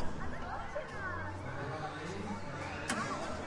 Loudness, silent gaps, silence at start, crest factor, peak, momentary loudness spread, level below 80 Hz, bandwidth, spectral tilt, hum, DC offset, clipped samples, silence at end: -40 LUFS; none; 0 s; 16 dB; -22 dBFS; 5 LU; -52 dBFS; 11.5 kHz; -4.5 dB/octave; none; under 0.1%; under 0.1%; 0 s